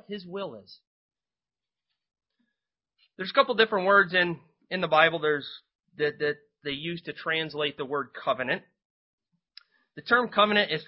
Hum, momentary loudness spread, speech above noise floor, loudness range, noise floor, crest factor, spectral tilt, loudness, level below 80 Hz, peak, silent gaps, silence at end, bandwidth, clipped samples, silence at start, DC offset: none; 16 LU; over 63 dB; 8 LU; under -90 dBFS; 24 dB; -8.5 dB/octave; -26 LUFS; -72 dBFS; -4 dBFS; 0.87-1.09 s, 5.75-5.79 s, 8.85-9.18 s; 0.05 s; 5.8 kHz; under 0.1%; 0.1 s; under 0.1%